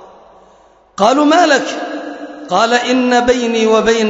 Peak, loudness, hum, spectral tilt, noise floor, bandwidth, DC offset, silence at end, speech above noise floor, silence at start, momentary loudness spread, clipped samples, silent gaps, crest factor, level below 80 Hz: 0 dBFS; -12 LUFS; none; -3.5 dB/octave; -47 dBFS; 8 kHz; under 0.1%; 0 s; 36 dB; 1 s; 16 LU; under 0.1%; none; 14 dB; -48 dBFS